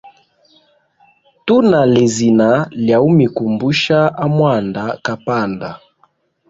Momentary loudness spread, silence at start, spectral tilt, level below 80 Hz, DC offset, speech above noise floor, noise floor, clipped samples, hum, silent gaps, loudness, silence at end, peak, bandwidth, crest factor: 10 LU; 0.05 s; -6 dB/octave; -52 dBFS; under 0.1%; 44 dB; -57 dBFS; under 0.1%; none; none; -14 LUFS; 0.75 s; -2 dBFS; 7.8 kHz; 14 dB